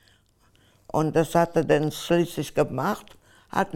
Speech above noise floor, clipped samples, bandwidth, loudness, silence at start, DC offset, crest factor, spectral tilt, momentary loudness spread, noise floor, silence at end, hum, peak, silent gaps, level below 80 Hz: 38 dB; under 0.1%; 17 kHz; -25 LUFS; 0.95 s; under 0.1%; 18 dB; -6 dB/octave; 7 LU; -61 dBFS; 0 s; none; -6 dBFS; none; -54 dBFS